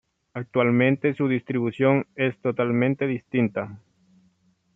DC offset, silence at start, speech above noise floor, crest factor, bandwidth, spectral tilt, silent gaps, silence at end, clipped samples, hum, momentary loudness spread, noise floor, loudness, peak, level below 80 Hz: under 0.1%; 0.35 s; 42 dB; 18 dB; 3.8 kHz; -9.5 dB/octave; none; 1 s; under 0.1%; none; 9 LU; -65 dBFS; -23 LUFS; -6 dBFS; -68 dBFS